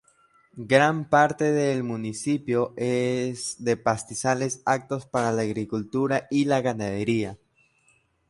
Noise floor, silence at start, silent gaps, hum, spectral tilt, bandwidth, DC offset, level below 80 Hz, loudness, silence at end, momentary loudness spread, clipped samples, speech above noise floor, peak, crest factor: -65 dBFS; 0.55 s; none; none; -5.5 dB/octave; 11.5 kHz; under 0.1%; -60 dBFS; -25 LUFS; 0.95 s; 9 LU; under 0.1%; 41 dB; -4 dBFS; 22 dB